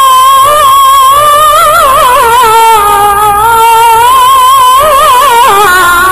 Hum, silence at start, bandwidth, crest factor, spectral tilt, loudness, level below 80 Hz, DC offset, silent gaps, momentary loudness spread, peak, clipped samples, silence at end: none; 0 s; 16 kHz; 4 dB; -1 dB/octave; -3 LUFS; -30 dBFS; under 0.1%; none; 2 LU; 0 dBFS; 8%; 0 s